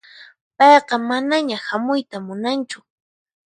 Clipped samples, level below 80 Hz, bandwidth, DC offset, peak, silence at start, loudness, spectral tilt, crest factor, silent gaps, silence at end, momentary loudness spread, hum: under 0.1%; -74 dBFS; 11 kHz; under 0.1%; 0 dBFS; 0.2 s; -18 LUFS; -4 dB/octave; 18 dB; 0.41-0.51 s; 0.7 s; 16 LU; none